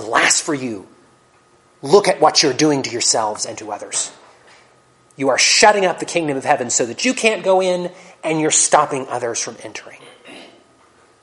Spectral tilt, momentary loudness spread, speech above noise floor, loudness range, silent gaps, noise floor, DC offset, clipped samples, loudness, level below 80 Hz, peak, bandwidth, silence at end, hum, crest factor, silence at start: -2 dB/octave; 15 LU; 36 dB; 3 LU; none; -53 dBFS; under 0.1%; under 0.1%; -16 LUFS; -62 dBFS; 0 dBFS; 11.5 kHz; 0.75 s; none; 18 dB; 0 s